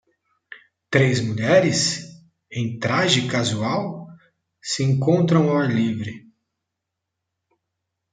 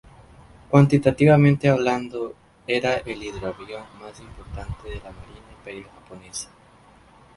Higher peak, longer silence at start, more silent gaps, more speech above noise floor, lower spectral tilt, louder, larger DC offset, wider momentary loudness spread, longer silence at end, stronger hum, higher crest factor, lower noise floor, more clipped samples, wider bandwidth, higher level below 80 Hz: about the same, -2 dBFS vs 0 dBFS; second, 0.5 s vs 0.7 s; neither; first, 62 dB vs 30 dB; second, -5 dB/octave vs -7 dB/octave; about the same, -20 LUFS vs -20 LUFS; neither; second, 13 LU vs 26 LU; first, 1.95 s vs 0.9 s; neither; about the same, 20 dB vs 22 dB; first, -82 dBFS vs -52 dBFS; neither; second, 9.4 kHz vs 11.5 kHz; second, -62 dBFS vs -46 dBFS